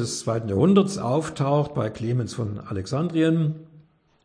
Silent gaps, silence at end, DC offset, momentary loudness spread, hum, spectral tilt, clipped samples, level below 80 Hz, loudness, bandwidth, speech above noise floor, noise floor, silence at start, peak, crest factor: none; 0.45 s; under 0.1%; 11 LU; none; -6.5 dB/octave; under 0.1%; -56 dBFS; -24 LUFS; 10.5 kHz; 31 dB; -54 dBFS; 0 s; -6 dBFS; 18 dB